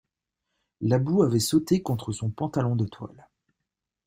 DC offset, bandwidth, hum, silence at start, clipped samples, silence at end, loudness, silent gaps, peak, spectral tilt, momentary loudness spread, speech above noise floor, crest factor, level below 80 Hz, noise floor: under 0.1%; 16 kHz; none; 0.8 s; under 0.1%; 1 s; -25 LUFS; none; -8 dBFS; -6.5 dB/octave; 10 LU; 60 dB; 18 dB; -58 dBFS; -85 dBFS